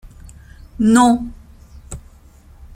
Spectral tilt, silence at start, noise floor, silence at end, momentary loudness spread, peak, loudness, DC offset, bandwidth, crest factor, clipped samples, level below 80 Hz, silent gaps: -5 dB/octave; 0.8 s; -45 dBFS; 0.75 s; 24 LU; -2 dBFS; -14 LUFS; under 0.1%; 15 kHz; 18 dB; under 0.1%; -40 dBFS; none